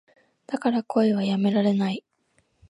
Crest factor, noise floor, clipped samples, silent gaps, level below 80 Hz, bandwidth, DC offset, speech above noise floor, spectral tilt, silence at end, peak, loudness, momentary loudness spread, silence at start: 16 dB; -68 dBFS; under 0.1%; none; -70 dBFS; 10.5 kHz; under 0.1%; 45 dB; -7.5 dB/octave; 0.7 s; -10 dBFS; -24 LUFS; 8 LU; 0.5 s